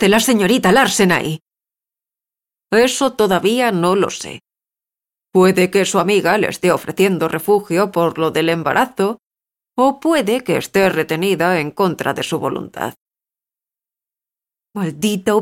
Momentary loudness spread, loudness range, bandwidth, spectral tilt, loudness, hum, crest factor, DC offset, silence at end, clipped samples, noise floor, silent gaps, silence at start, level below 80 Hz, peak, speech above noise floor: 12 LU; 5 LU; 17 kHz; -4.5 dB/octave; -16 LUFS; none; 14 dB; under 0.1%; 0 s; under 0.1%; under -90 dBFS; 13.01-13.06 s; 0 s; -54 dBFS; -2 dBFS; over 75 dB